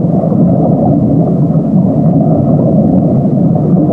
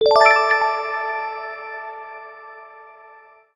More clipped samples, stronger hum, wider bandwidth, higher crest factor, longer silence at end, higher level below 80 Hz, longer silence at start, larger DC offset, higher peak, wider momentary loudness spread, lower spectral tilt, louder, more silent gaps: neither; neither; second, 2.1 kHz vs 10 kHz; second, 8 dB vs 20 dB; second, 0 s vs 0.65 s; first, -36 dBFS vs -62 dBFS; about the same, 0 s vs 0 s; first, 0.8% vs under 0.1%; about the same, 0 dBFS vs 0 dBFS; second, 1 LU vs 26 LU; first, -13.5 dB/octave vs -1 dB/octave; first, -9 LUFS vs -18 LUFS; neither